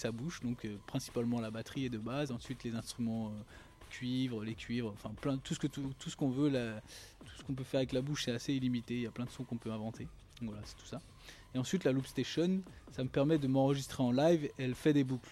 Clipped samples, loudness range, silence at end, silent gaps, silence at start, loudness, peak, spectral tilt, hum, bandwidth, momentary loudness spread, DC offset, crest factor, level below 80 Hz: under 0.1%; 7 LU; 0 s; none; 0 s; -37 LUFS; -18 dBFS; -6 dB/octave; none; 14.5 kHz; 17 LU; under 0.1%; 18 dB; -60 dBFS